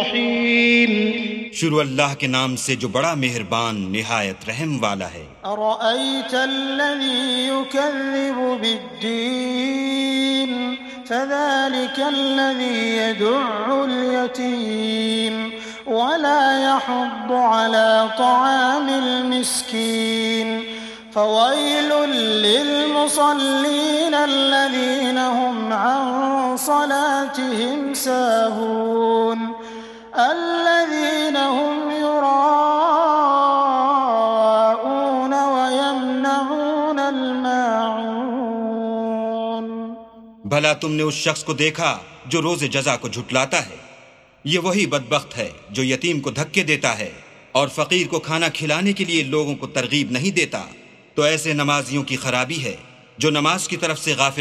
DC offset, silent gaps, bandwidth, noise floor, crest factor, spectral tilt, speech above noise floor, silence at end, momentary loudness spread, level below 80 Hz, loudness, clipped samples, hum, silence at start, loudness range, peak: under 0.1%; none; 15 kHz; -48 dBFS; 20 dB; -3.5 dB/octave; 29 dB; 0 s; 8 LU; -62 dBFS; -19 LUFS; under 0.1%; none; 0 s; 5 LU; 0 dBFS